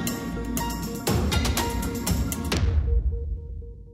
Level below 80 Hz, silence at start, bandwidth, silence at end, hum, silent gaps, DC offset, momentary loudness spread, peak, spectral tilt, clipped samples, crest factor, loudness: -28 dBFS; 0 s; 16 kHz; 0 s; none; none; under 0.1%; 10 LU; -10 dBFS; -5 dB/octave; under 0.1%; 16 dB; -27 LUFS